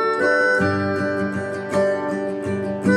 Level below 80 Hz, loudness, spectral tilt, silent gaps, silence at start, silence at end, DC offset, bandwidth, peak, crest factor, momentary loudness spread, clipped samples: -58 dBFS; -21 LUFS; -6.5 dB/octave; none; 0 s; 0 s; under 0.1%; 11.5 kHz; -6 dBFS; 16 dB; 8 LU; under 0.1%